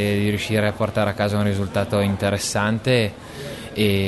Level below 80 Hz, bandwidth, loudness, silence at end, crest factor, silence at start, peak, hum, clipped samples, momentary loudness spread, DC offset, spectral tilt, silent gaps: -48 dBFS; 12.5 kHz; -21 LUFS; 0 s; 14 dB; 0 s; -6 dBFS; none; under 0.1%; 8 LU; under 0.1%; -5.5 dB/octave; none